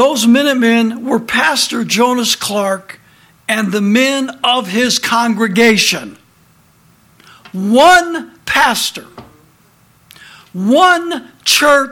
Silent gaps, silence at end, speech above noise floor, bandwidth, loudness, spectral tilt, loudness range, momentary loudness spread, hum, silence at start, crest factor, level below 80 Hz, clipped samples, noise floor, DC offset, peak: none; 0 s; 38 dB; 17 kHz; -12 LUFS; -3 dB/octave; 2 LU; 13 LU; none; 0 s; 14 dB; -52 dBFS; under 0.1%; -50 dBFS; under 0.1%; 0 dBFS